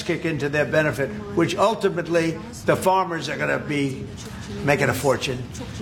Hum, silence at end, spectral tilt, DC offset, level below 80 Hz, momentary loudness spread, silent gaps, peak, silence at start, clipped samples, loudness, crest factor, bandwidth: none; 0 s; -5.5 dB/octave; under 0.1%; -48 dBFS; 10 LU; none; -2 dBFS; 0 s; under 0.1%; -22 LUFS; 20 dB; 17 kHz